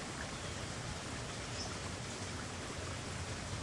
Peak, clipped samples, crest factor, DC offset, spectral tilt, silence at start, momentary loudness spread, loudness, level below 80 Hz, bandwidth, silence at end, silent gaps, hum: -30 dBFS; under 0.1%; 14 dB; under 0.1%; -3.5 dB/octave; 0 s; 1 LU; -42 LUFS; -56 dBFS; 11.5 kHz; 0 s; none; none